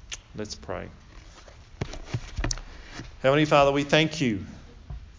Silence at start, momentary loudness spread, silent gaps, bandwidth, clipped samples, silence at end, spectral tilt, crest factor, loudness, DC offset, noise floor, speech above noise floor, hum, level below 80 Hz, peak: 0.05 s; 23 LU; none; 7.6 kHz; under 0.1%; 0.05 s; -5 dB/octave; 22 dB; -25 LUFS; under 0.1%; -48 dBFS; 24 dB; none; -42 dBFS; -6 dBFS